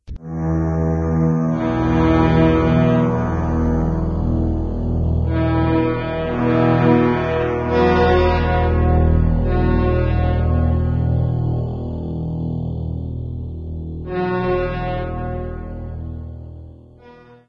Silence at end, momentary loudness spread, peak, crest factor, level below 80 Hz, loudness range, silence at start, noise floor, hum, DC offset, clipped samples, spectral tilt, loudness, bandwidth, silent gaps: 0.35 s; 14 LU; -2 dBFS; 16 dB; -26 dBFS; 8 LU; 0.1 s; -44 dBFS; none; under 0.1%; under 0.1%; -9.5 dB/octave; -19 LUFS; 6.8 kHz; none